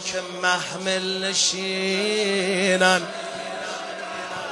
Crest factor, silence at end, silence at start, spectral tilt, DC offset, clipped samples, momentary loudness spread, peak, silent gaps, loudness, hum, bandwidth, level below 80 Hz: 20 dB; 0 s; 0 s; -2.5 dB/octave; under 0.1%; under 0.1%; 12 LU; -4 dBFS; none; -23 LUFS; none; 11.5 kHz; -70 dBFS